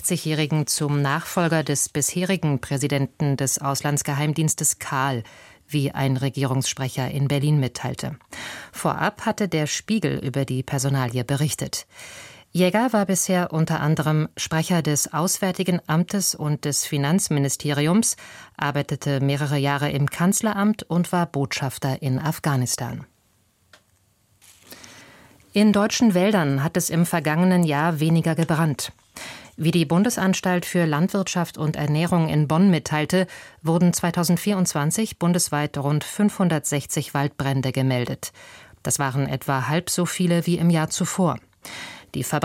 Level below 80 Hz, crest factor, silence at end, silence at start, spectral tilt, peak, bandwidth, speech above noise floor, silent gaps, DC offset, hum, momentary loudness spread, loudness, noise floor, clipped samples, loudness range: -56 dBFS; 16 dB; 0 s; 0 s; -5 dB/octave; -6 dBFS; 16.5 kHz; 41 dB; none; under 0.1%; none; 10 LU; -22 LUFS; -63 dBFS; under 0.1%; 4 LU